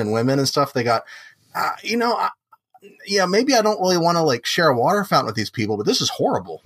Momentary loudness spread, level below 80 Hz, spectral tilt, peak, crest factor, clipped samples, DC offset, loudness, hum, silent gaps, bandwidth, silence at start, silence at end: 8 LU; -68 dBFS; -4 dB/octave; -4 dBFS; 16 dB; under 0.1%; under 0.1%; -19 LUFS; none; none; 15.5 kHz; 0 s; 0.1 s